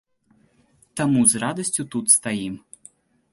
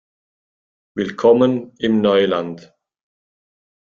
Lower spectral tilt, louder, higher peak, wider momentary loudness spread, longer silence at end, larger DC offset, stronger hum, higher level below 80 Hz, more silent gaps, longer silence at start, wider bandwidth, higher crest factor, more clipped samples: second, -3.5 dB/octave vs -7 dB/octave; about the same, -19 LUFS vs -17 LUFS; about the same, -2 dBFS vs -2 dBFS; about the same, 16 LU vs 17 LU; second, 0.75 s vs 1.35 s; neither; neither; about the same, -60 dBFS vs -60 dBFS; neither; about the same, 0.95 s vs 0.95 s; first, 12 kHz vs 7.2 kHz; about the same, 22 dB vs 18 dB; neither